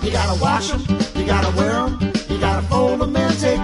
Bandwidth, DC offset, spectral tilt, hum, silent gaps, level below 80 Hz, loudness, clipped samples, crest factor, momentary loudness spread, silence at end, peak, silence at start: 11.5 kHz; under 0.1%; -5.5 dB/octave; none; none; -26 dBFS; -19 LUFS; under 0.1%; 14 dB; 3 LU; 0 s; -4 dBFS; 0 s